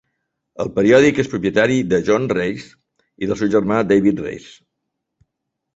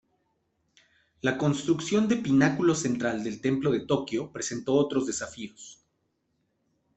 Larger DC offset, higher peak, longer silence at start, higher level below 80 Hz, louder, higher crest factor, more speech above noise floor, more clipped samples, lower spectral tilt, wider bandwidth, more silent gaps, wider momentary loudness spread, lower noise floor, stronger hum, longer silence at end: neither; first, -2 dBFS vs -8 dBFS; second, 0.6 s vs 1.25 s; first, -50 dBFS vs -64 dBFS; first, -17 LUFS vs -27 LUFS; about the same, 18 dB vs 20 dB; first, 61 dB vs 49 dB; neither; about the same, -6 dB/octave vs -5 dB/octave; about the same, 8 kHz vs 8.4 kHz; neither; first, 15 LU vs 12 LU; about the same, -78 dBFS vs -75 dBFS; neither; about the same, 1.35 s vs 1.25 s